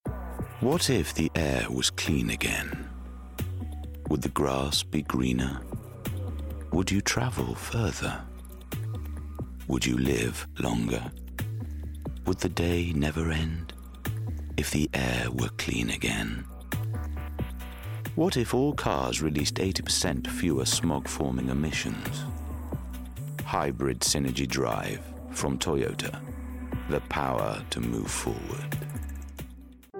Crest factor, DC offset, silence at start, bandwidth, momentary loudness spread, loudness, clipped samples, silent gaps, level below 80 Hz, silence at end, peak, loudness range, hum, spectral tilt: 18 dB; under 0.1%; 0.05 s; 17 kHz; 12 LU; -30 LUFS; under 0.1%; none; -40 dBFS; 0 s; -12 dBFS; 3 LU; none; -4.5 dB/octave